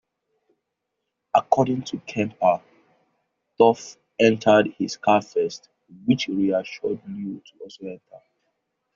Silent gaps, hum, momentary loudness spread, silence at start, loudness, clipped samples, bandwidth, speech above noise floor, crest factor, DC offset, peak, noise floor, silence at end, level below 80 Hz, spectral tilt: none; none; 19 LU; 1.35 s; -22 LUFS; under 0.1%; 7.6 kHz; 58 dB; 22 dB; under 0.1%; -2 dBFS; -80 dBFS; 0.8 s; -64 dBFS; -4.5 dB/octave